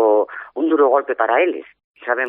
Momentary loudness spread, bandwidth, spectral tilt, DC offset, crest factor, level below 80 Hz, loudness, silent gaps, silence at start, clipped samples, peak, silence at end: 12 LU; 3.7 kHz; -6.5 dB/octave; under 0.1%; 14 dB; -74 dBFS; -18 LUFS; 1.84-1.94 s; 0 s; under 0.1%; -2 dBFS; 0 s